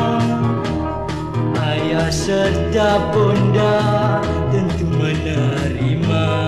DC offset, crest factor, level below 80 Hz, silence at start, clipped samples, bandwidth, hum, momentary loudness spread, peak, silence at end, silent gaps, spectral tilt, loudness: under 0.1%; 14 dB; -32 dBFS; 0 s; under 0.1%; 12 kHz; none; 6 LU; -2 dBFS; 0 s; none; -6.5 dB/octave; -18 LUFS